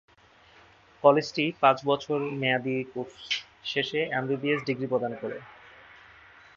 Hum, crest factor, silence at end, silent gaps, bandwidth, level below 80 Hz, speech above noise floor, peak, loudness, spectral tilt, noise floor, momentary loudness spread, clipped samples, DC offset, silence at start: none; 24 dB; 0.9 s; none; 7.4 kHz; -70 dBFS; 31 dB; -6 dBFS; -27 LUFS; -5.5 dB/octave; -57 dBFS; 12 LU; under 0.1%; under 0.1%; 1.05 s